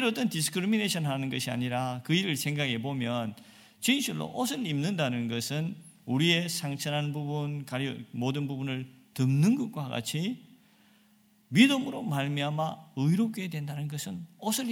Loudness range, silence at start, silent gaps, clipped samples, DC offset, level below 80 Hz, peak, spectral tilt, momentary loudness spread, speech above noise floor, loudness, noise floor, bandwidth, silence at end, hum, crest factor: 2 LU; 0 s; none; under 0.1%; under 0.1%; -72 dBFS; -8 dBFS; -5 dB/octave; 10 LU; 34 dB; -30 LUFS; -63 dBFS; 17.5 kHz; 0 s; none; 22 dB